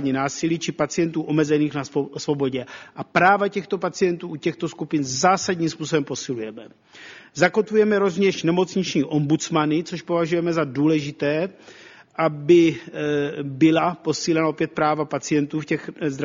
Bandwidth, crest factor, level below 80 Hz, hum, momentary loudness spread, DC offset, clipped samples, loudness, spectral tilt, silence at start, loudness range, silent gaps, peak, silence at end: 7.6 kHz; 20 dB; -62 dBFS; none; 10 LU; under 0.1%; under 0.1%; -22 LUFS; -5.5 dB/octave; 0 s; 3 LU; none; -2 dBFS; 0 s